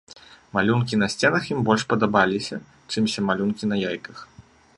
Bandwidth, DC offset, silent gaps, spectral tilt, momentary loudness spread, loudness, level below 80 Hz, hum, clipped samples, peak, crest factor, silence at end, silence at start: 11.5 kHz; under 0.1%; none; -5.5 dB/octave; 12 LU; -23 LUFS; -56 dBFS; none; under 0.1%; -4 dBFS; 20 dB; 0.35 s; 0.1 s